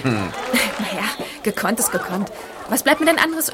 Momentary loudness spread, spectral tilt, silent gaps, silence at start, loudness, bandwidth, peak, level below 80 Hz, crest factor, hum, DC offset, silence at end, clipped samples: 10 LU; -3 dB/octave; none; 0 s; -20 LUFS; 17 kHz; -2 dBFS; -52 dBFS; 20 dB; none; under 0.1%; 0 s; under 0.1%